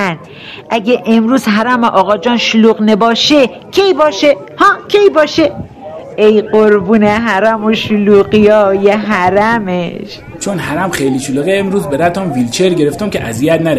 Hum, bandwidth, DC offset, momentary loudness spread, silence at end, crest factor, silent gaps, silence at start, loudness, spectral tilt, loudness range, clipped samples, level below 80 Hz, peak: none; 14 kHz; 0.1%; 10 LU; 0 s; 10 dB; none; 0 s; -10 LUFS; -5 dB/octave; 4 LU; 0.6%; -44 dBFS; 0 dBFS